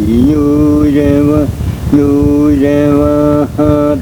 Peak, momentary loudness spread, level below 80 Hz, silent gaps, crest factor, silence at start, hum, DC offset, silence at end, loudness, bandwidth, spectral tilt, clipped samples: 0 dBFS; 3 LU; -24 dBFS; none; 8 dB; 0 s; none; under 0.1%; 0 s; -10 LUFS; 19 kHz; -8.5 dB/octave; 0.4%